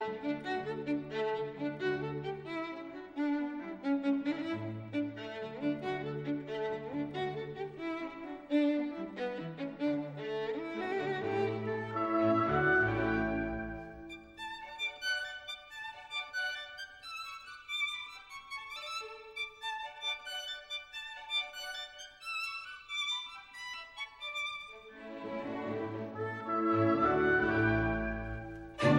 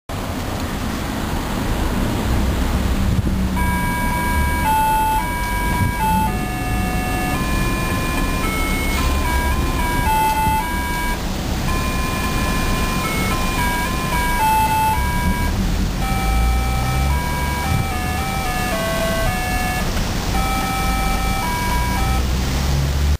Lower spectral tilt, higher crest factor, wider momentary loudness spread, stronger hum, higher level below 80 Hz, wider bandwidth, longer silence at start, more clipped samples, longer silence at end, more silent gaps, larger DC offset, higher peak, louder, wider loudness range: about the same, -5.5 dB/octave vs -4.5 dB/octave; first, 22 dB vs 12 dB; first, 15 LU vs 5 LU; neither; second, -56 dBFS vs -22 dBFS; about the same, 15.5 kHz vs 15.5 kHz; about the same, 0 s vs 0.1 s; neither; about the same, 0 s vs 0.05 s; neither; second, under 0.1% vs 0.4%; second, -14 dBFS vs -6 dBFS; second, -36 LUFS vs -20 LUFS; first, 7 LU vs 2 LU